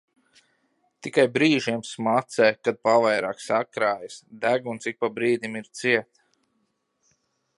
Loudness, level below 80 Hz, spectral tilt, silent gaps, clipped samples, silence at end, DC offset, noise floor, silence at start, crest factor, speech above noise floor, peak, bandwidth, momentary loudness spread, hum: -24 LUFS; -74 dBFS; -4.5 dB/octave; none; under 0.1%; 1.55 s; under 0.1%; -73 dBFS; 1.05 s; 20 dB; 49 dB; -6 dBFS; 11.5 kHz; 9 LU; none